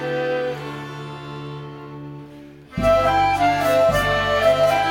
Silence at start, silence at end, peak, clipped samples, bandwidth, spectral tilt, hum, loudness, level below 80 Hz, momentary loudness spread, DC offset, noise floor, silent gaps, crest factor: 0 s; 0 s; -6 dBFS; under 0.1%; 18 kHz; -5 dB/octave; none; -18 LUFS; -40 dBFS; 19 LU; under 0.1%; -41 dBFS; none; 14 dB